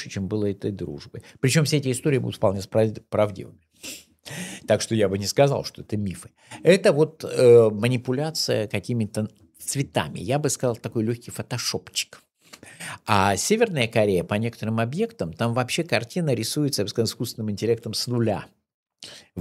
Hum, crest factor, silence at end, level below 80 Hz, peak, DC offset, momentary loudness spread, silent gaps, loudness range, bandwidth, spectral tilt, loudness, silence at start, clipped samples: none; 22 dB; 0 s; -60 dBFS; -2 dBFS; under 0.1%; 15 LU; 18.74-18.86 s; 6 LU; 16 kHz; -5 dB/octave; -23 LUFS; 0 s; under 0.1%